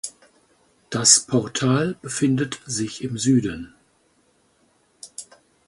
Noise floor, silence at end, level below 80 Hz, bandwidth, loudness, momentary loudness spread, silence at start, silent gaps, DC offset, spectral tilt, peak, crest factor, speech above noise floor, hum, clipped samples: -63 dBFS; 0.45 s; -56 dBFS; 11.5 kHz; -20 LUFS; 23 LU; 0.05 s; none; under 0.1%; -3.5 dB/octave; 0 dBFS; 24 dB; 42 dB; none; under 0.1%